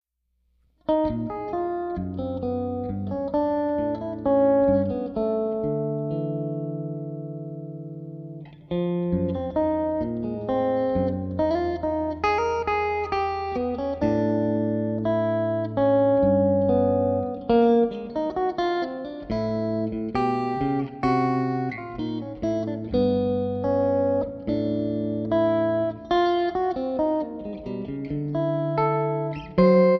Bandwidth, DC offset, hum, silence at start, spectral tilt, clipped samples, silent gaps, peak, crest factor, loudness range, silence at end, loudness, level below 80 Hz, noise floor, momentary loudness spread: 6.4 kHz; under 0.1%; none; 0.9 s; -9 dB/octave; under 0.1%; none; -6 dBFS; 18 dB; 6 LU; 0 s; -25 LUFS; -48 dBFS; -72 dBFS; 10 LU